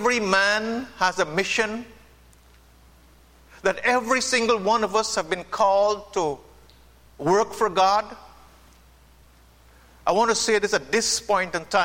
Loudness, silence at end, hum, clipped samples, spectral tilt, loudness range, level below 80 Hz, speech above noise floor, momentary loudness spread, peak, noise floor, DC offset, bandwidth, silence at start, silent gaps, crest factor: -22 LUFS; 0 s; none; under 0.1%; -2.5 dB/octave; 4 LU; -54 dBFS; 31 dB; 8 LU; -6 dBFS; -53 dBFS; under 0.1%; 16.5 kHz; 0 s; none; 18 dB